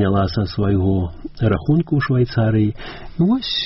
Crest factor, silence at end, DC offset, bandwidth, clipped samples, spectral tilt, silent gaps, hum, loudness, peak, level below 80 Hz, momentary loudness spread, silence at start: 12 dB; 0 s; under 0.1%; 5.8 kHz; under 0.1%; -6 dB/octave; none; none; -19 LUFS; -6 dBFS; -36 dBFS; 5 LU; 0 s